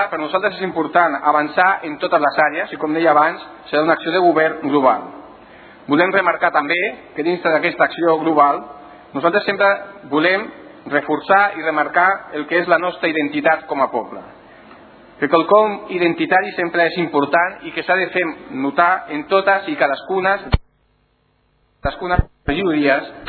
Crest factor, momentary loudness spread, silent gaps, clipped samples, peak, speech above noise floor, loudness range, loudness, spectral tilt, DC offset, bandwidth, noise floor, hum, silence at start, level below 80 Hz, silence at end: 18 dB; 9 LU; none; under 0.1%; 0 dBFS; 44 dB; 3 LU; -17 LUFS; -9 dB/octave; under 0.1%; 4.6 kHz; -61 dBFS; none; 0 s; -38 dBFS; 0 s